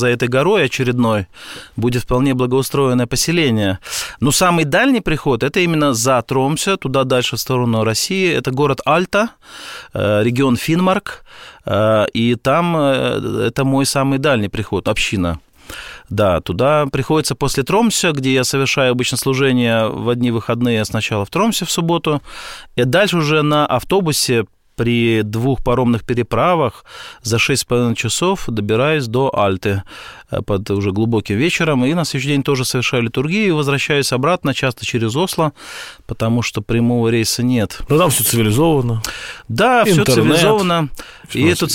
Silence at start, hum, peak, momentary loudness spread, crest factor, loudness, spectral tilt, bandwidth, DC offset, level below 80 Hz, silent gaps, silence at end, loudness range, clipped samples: 0 s; none; -2 dBFS; 9 LU; 14 dB; -16 LUFS; -5 dB/octave; 17 kHz; 0.3%; -40 dBFS; none; 0 s; 3 LU; under 0.1%